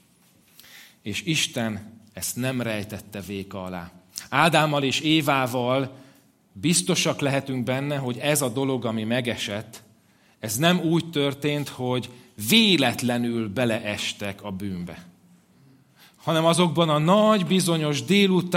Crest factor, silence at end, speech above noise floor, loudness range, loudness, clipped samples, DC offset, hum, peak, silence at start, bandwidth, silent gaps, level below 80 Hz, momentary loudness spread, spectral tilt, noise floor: 22 dB; 0 s; 36 dB; 6 LU; -23 LUFS; under 0.1%; under 0.1%; none; -4 dBFS; 0.7 s; 16.5 kHz; none; -66 dBFS; 15 LU; -4.5 dB/octave; -59 dBFS